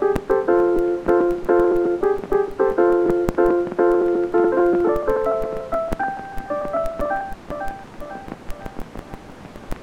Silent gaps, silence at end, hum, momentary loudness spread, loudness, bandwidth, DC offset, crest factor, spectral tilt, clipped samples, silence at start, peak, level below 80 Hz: none; 0 s; none; 18 LU; -20 LUFS; 8.8 kHz; under 0.1%; 18 dB; -7.5 dB/octave; under 0.1%; 0 s; -2 dBFS; -38 dBFS